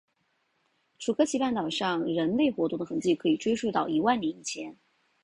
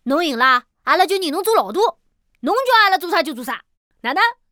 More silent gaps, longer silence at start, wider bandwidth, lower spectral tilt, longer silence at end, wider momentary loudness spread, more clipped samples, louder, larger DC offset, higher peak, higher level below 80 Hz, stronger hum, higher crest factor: second, none vs 3.77-3.91 s; first, 1 s vs 0.05 s; second, 11 kHz vs over 20 kHz; first, -4.5 dB/octave vs -2 dB/octave; first, 0.5 s vs 0.2 s; second, 10 LU vs 14 LU; neither; second, -28 LUFS vs -17 LUFS; neither; second, -12 dBFS vs -2 dBFS; about the same, -66 dBFS vs -66 dBFS; neither; about the same, 18 dB vs 16 dB